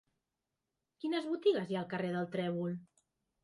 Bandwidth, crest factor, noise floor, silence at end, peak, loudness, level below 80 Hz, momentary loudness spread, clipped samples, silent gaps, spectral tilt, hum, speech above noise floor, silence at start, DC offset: 11.5 kHz; 18 dB; -89 dBFS; 0.6 s; -20 dBFS; -36 LUFS; -80 dBFS; 9 LU; under 0.1%; none; -7.5 dB/octave; none; 53 dB; 1.05 s; under 0.1%